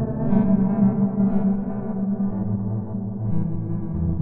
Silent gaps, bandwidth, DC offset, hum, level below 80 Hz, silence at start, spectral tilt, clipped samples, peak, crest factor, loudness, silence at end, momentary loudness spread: none; 2.5 kHz; under 0.1%; none; -38 dBFS; 0 s; -15 dB/octave; under 0.1%; -6 dBFS; 16 dB; -23 LUFS; 0 s; 8 LU